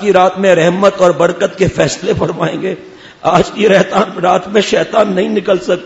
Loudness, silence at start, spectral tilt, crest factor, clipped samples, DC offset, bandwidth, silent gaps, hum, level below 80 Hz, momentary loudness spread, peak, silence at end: -12 LUFS; 0 s; -5 dB/octave; 12 dB; 0.3%; under 0.1%; 8 kHz; none; none; -42 dBFS; 7 LU; 0 dBFS; 0 s